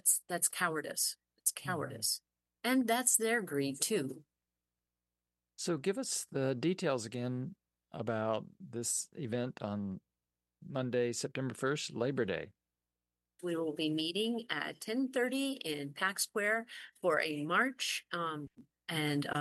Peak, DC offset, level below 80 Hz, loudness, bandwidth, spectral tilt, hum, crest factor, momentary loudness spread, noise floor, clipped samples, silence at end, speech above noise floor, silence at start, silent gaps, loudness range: -12 dBFS; under 0.1%; -82 dBFS; -35 LUFS; 12.5 kHz; -3 dB/octave; 60 Hz at -65 dBFS; 24 dB; 10 LU; under -90 dBFS; under 0.1%; 0 s; over 55 dB; 0.05 s; none; 5 LU